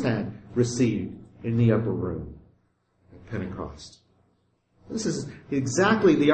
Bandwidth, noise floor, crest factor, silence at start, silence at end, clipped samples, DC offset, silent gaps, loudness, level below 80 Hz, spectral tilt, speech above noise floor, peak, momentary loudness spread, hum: 8.8 kHz; -68 dBFS; 18 dB; 0 s; 0 s; under 0.1%; under 0.1%; none; -26 LUFS; -52 dBFS; -6 dB/octave; 44 dB; -8 dBFS; 17 LU; none